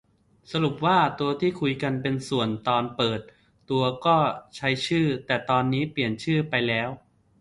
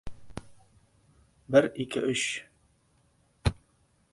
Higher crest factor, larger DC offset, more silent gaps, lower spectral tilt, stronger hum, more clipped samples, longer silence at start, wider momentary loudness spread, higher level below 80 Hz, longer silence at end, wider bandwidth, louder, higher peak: second, 18 dB vs 24 dB; neither; neither; first, -6 dB/octave vs -4.5 dB/octave; neither; neither; first, 0.5 s vs 0.05 s; second, 6 LU vs 22 LU; second, -58 dBFS vs -48 dBFS; second, 0.4 s vs 0.6 s; about the same, 11.5 kHz vs 11.5 kHz; first, -25 LUFS vs -28 LUFS; about the same, -8 dBFS vs -8 dBFS